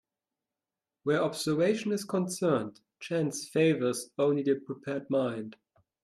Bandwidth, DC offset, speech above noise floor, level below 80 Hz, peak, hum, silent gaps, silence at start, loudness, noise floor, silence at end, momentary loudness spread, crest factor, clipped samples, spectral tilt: 14 kHz; under 0.1%; over 61 dB; -76 dBFS; -14 dBFS; none; none; 1.05 s; -30 LUFS; under -90 dBFS; 0.5 s; 10 LU; 16 dB; under 0.1%; -5.5 dB/octave